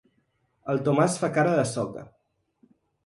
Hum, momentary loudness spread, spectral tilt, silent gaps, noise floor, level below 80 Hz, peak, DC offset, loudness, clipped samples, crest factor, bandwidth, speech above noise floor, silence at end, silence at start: none; 14 LU; -6 dB/octave; none; -71 dBFS; -64 dBFS; -8 dBFS; under 0.1%; -25 LUFS; under 0.1%; 18 dB; 11.5 kHz; 47 dB; 1 s; 0.65 s